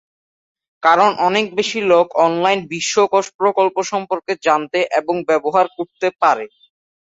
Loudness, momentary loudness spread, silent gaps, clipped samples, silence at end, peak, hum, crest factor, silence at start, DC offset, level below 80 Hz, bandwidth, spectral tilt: -17 LUFS; 8 LU; 3.35-3.39 s; under 0.1%; 0.55 s; -2 dBFS; none; 16 dB; 0.85 s; under 0.1%; -66 dBFS; 8 kHz; -3.5 dB/octave